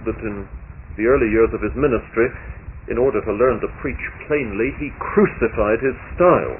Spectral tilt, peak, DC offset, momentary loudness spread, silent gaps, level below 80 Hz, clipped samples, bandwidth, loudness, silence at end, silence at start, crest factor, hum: -12 dB/octave; -4 dBFS; under 0.1%; 16 LU; none; -34 dBFS; under 0.1%; 3.1 kHz; -20 LUFS; 0 s; 0 s; 16 dB; none